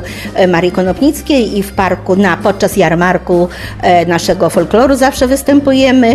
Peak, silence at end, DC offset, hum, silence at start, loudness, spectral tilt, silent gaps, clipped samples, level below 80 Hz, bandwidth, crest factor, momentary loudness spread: 0 dBFS; 0 s; under 0.1%; none; 0 s; -11 LUFS; -5.5 dB/octave; none; 0.3%; -32 dBFS; 14 kHz; 10 dB; 5 LU